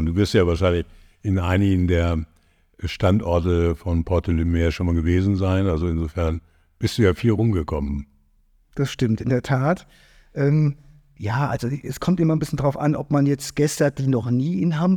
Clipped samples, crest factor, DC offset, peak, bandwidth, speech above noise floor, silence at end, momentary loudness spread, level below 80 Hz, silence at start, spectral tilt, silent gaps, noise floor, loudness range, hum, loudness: under 0.1%; 16 dB; under 0.1%; -4 dBFS; 14.5 kHz; 39 dB; 0 s; 9 LU; -34 dBFS; 0 s; -7 dB/octave; none; -59 dBFS; 3 LU; none; -22 LUFS